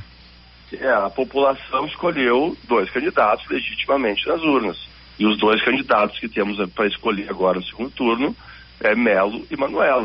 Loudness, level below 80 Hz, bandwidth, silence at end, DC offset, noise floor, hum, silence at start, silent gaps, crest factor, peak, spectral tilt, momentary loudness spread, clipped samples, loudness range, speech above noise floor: -20 LUFS; -50 dBFS; 5.8 kHz; 0 s; under 0.1%; -46 dBFS; none; 0 s; none; 16 dB; -4 dBFS; -2.5 dB/octave; 8 LU; under 0.1%; 2 LU; 26 dB